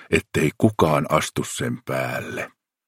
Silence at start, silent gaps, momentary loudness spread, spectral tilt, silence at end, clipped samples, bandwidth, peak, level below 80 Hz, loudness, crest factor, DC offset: 0 s; none; 11 LU; -5 dB/octave; 0.4 s; under 0.1%; 16.5 kHz; -2 dBFS; -50 dBFS; -23 LUFS; 22 dB; under 0.1%